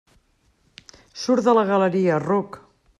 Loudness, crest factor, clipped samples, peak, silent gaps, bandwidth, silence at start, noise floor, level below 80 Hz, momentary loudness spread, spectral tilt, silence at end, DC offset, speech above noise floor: -20 LUFS; 18 dB; under 0.1%; -6 dBFS; none; 11 kHz; 1.15 s; -63 dBFS; -64 dBFS; 15 LU; -6.5 dB/octave; 0.4 s; under 0.1%; 44 dB